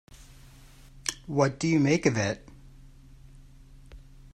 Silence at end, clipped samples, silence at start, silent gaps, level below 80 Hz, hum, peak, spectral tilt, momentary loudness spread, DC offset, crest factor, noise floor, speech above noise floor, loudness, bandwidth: 0.35 s; under 0.1%; 0.95 s; none; -52 dBFS; none; -8 dBFS; -5.5 dB/octave; 11 LU; under 0.1%; 22 dB; -51 dBFS; 26 dB; -27 LUFS; 14.5 kHz